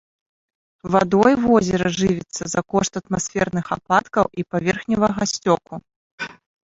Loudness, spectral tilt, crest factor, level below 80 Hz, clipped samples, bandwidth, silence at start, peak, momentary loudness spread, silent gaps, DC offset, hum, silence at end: -20 LUFS; -5 dB/octave; 20 dB; -50 dBFS; under 0.1%; 8 kHz; 0.85 s; -2 dBFS; 17 LU; 5.96-6.18 s; under 0.1%; none; 0.35 s